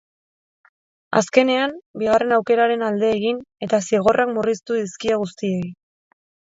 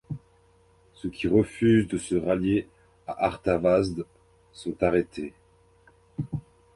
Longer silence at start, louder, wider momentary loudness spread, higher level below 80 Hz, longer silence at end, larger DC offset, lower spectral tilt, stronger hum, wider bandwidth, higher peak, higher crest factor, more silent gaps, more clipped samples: first, 1.1 s vs 0.1 s; first, -20 LUFS vs -26 LUFS; second, 8 LU vs 18 LU; second, -60 dBFS vs -50 dBFS; first, 0.75 s vs 0.35 s; neither; second, -5 dB/octave vs -7 dB/octave; neither; second, 7.8 kHz vs 11.5 kHz; first, 0 dBFS vs -8 dBFS; about the same, 20 dB vs 18 dB; first, 1.86-1.94 s vs none; neither